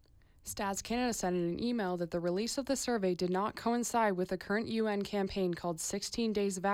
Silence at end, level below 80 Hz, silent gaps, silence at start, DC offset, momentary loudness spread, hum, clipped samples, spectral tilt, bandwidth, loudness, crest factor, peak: 0 s; -60 dBFS; none; 0.45 s; under 0.1%; 4 LU; none; under 0.1%; -4.5 dB/octave; 19.5 kHz; -34 LUFS; 14 dB; -20 dBFS